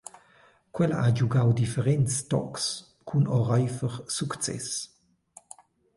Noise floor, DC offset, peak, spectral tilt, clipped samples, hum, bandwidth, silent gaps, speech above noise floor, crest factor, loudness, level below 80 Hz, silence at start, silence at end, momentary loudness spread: -60 dBFS; under 0.1%; -12 dBFS; -5.5 dB/octave; under 0.1%; none; 11.5 kHz; none; 34 dB; 16 dB; -27 LUFS; -58 dBFS; 0.75 s; 1.1 s; 15 LU